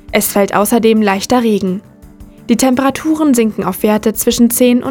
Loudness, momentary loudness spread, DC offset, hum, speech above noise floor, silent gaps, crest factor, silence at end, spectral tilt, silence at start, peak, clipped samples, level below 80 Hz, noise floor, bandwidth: -12 LUFS; 5 LU; under 0.1%; none; 25 dB; none; 12 dB; 0 s; -4.5 dB/octave; 0.1 s; 0 dBFS; under 0.1%; -42 dBFS; -37 dBFS; 20 kHz